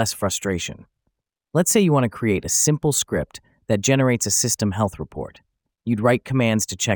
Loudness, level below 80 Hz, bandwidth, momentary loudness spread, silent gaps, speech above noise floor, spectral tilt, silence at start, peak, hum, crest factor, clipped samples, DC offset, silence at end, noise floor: -20 LUFS; -50 dBFS; over 20 kHz; 15 LU; none; 55 dB; -4 dB/octave; 0 s; -2 dBFS; none; 18 dB; under 0.1%; under 0.1%; 0 s; -75 dBFS